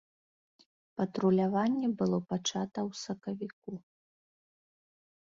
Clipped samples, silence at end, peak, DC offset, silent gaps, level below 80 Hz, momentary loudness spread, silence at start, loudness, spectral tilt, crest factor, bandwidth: under 0.1%; 1.55 s; -16 dBFS; under 0.1%; 3.53-3.62 s; -74 dBFS; 17 LU; 0.95 s; -32 LUFS; -6 dB/octave; 18 dB; 7.6 kHz